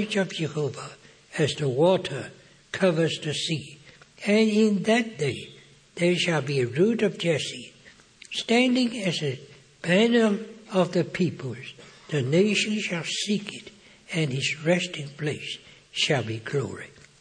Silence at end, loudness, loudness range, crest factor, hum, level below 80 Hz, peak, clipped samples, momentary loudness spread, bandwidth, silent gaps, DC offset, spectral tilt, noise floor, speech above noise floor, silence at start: 0.35 s; -25 LUFS; 3 LU; 18 dB; none; -68 dBFS; -8 dBFS; under 0.1%; 16 LU; 10 kHz; none; under 0.1%; -5 dB/octave; -53 dBFS; 28 dB; 0 s